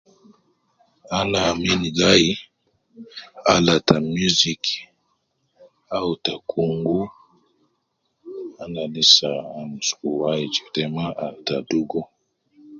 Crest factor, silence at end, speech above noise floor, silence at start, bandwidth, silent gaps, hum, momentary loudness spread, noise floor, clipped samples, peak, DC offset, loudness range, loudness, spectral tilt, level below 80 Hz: 24 dB; 0 s; 51 dB; 1.1 s; 7.8 kHz; none; none; 18 LU; -72 dBFS; under 0.1%; 0 dBFS; under 0.1%; 8 LU; -20 LUFS; -3.5 dB/octave; -52 dBFS